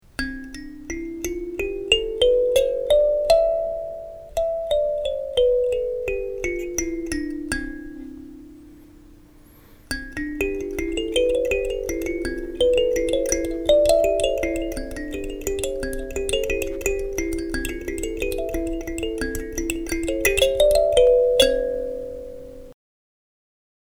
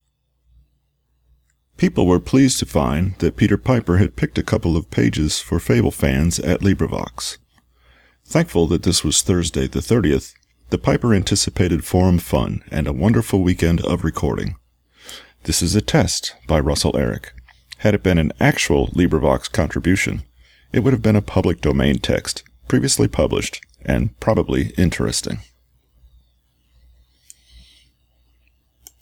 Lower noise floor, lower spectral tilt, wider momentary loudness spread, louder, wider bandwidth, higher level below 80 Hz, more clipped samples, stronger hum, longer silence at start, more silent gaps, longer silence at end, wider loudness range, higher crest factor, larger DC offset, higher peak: second, -49 dBFS vs -66 dBFS; second, -3 dB/octave vs -5 dB/octave; first, 14 LU vs 8 LU; second, -22 LUFS vs -18 LUFS; about the same, over 20 kHz vs 18.5 kHz; about the same, -36 dBFS vs -32 dBFS; neither; neither; second, 0.2 s vs 1.8 s; neither; second, 1.1 s vs 3.6 s; first, 10 LU vs 3 LU; about the same, 22 dB vs 18 dB; neither; about the same, -2 dBFS vs -2 dBFS